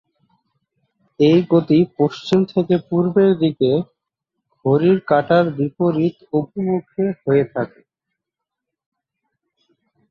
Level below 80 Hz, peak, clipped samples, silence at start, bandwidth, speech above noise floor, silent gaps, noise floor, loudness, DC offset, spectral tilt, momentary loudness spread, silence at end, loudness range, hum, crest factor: -60 dBFS; -4 dBFS; under 0.1%; 1.2 s; 7.2 kHz; 66 dB; none; -83 dBFS; -18 LUFS; under 0.1%; -8.5 dB/octave; 8 LU; 2.45 s; 7 LU; none; 16 dB